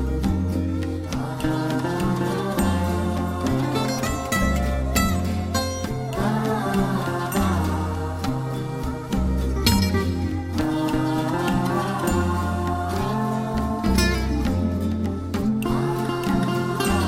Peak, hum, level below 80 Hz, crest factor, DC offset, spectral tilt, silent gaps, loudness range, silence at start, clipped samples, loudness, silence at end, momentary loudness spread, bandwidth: -6 dBFS; none; -32 dBFS; 16 dB; under 0.1%; -6 dB/octave; none; 1 LU; 0 s; under 0.1%; -24 LUFS; 0 s; 5 LU; 16 kHz